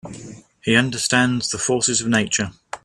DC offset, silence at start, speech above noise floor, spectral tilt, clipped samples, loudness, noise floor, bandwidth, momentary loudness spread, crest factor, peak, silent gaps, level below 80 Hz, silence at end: under 0.1%; 0.05 s; 20 dB; -3 dB/octave; under 0.1%; -19 LUFS; -40 dBFS; 13 kHz; 11 LU; 20 dB; 0 dBFS; none; -54 dBFS; 0.05 s